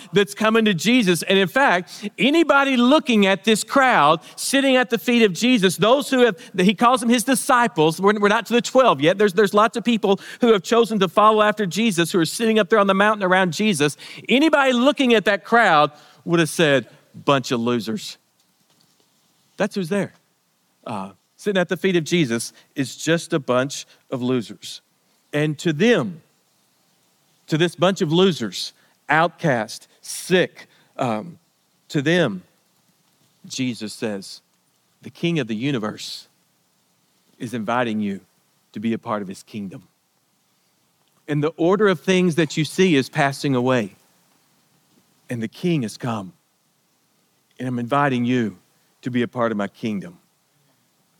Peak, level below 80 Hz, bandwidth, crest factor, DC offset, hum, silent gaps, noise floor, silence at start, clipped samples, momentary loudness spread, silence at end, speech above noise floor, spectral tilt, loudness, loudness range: -2 dBFS; -70 dBFS; 18 kHz; 18 dB; under 0.1%; none; none; -66 dBFS; 0 s; under 0.1%; 15 LU; 1.05 s; 46 dB; -5 dB/octave; -19 LUFS; 11 LU